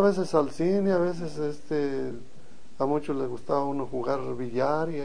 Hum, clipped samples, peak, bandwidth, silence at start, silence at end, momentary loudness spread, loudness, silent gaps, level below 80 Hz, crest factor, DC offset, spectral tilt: none; under 0.1%; -8 dBFS; 10 kHz; 0 s; 0 s; 8 LU; -28 LUFS; none; -58 dBFS; 20 dB; 2%; -7.5 dB/octave